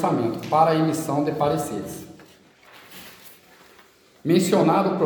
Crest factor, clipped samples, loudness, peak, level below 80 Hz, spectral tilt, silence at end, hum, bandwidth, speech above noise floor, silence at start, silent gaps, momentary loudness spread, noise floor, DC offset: 18 dB; under 0.1%; -22 LUFS; -4 dBFS; -62 dBFS; -6 dB/octave; 0 s; none; 19 kHz; 33 dB; 0 s; none; 23 LU; -54 dBFS; under 0.1%